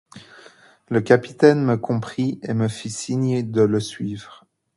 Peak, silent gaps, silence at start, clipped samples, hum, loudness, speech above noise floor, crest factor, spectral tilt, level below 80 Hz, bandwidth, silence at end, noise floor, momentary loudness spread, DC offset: 0 dBFS; none; 0.15 s; under 0.1%; none; -21 LUFS; 29 dB; 22 dB; -6.5 dB/octave; -58 dBFS; 11.5 kHz; 0.45 s; -49 dBFS; 13 LU; under 0.1%